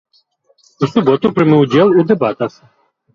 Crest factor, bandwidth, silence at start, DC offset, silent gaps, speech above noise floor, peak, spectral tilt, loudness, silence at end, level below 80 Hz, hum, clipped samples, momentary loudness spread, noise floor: 14 dB; 7.2 kHz; 0.8 s; under 0.1%; none; 45 dB; 0 dBFS; -8 dB/octave; -13 LUFS; 0.65 s; -54 dBFS; none; under 0.1%; 10 LU; -57 dBFS